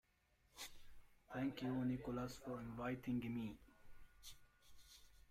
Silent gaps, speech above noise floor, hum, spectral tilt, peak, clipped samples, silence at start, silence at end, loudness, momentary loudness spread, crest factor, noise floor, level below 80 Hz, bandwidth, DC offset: none; 33 dB; none; -6 dB/octave; -32 dBFS; under 0.1%; 0.55 s; 0.1 s; -47 LUFS; 21 LU; 16 dB; -78 dBFS; -66 dBFS; 16 kHz; under 0.1%